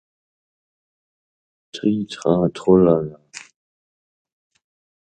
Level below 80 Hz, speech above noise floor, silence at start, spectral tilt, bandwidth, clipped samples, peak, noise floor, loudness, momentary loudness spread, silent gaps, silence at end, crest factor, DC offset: -52 dBFS; over 73 dB; 1.75 s; -7.5 dB/octave; 9.2 kHz; under 0.1%; -2 dBFS; under -90 dBFS; -18 LUFS; 24 LU; none; 1.65 s; 20 dB; under 0.1%